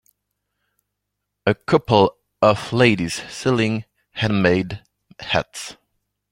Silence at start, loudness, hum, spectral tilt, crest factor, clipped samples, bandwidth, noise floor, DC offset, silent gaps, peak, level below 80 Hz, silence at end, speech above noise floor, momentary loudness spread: 1.45 s; -20 LUFS; 50 Hz at -45 dBFS; -5.5 dB/octave; 20 dB; under 0.1%; 16 kHz; -79 dBFS; under 0.1%; none; -2 dBFS; -52 dBFS; 0.6 s; 60 dB; 16 LU